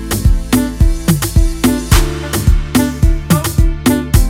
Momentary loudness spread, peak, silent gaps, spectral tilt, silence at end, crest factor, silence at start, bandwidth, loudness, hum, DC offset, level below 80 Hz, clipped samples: 3 LU; 0 dBFS; none; -5.5 dB/octave; 0 s; 12 dB; 0 s; 17 kHz; -14 LUFS; none; under 0.1%; -14 dBFS; under 0.1%